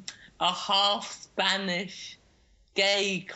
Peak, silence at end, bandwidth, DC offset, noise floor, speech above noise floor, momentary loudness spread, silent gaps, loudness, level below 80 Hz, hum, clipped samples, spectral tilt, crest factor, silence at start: -10 dBFS; 0 s; 8.2 kHz; under 0.1%; -62 dBFS; 34 dB; 16 LU; none; -26 LUFS; -68 dBFS; none; under 0.1%; -2 dB/octave; 20 dB; 0 s